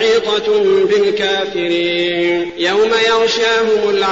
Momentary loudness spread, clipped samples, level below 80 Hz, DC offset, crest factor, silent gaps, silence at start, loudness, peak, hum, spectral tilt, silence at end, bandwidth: 4 LU; under 0.1%; -52 dBFS; 0.3%; 10 dB; none; 0 s; -14 LUFS; -4 dBFS; none; -1 dB/octave; 0 s; 7.8 kHz